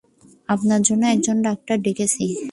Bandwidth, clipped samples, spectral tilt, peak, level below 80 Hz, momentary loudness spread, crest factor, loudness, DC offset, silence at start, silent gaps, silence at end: 11.5 kHz; under 0.1%; -4.5 dB/octave; -4 dBFS; -60 dBFS; 6 LU; 16 dB; -20 LUFS; under 0.1%; 0.5 s; none; 0 s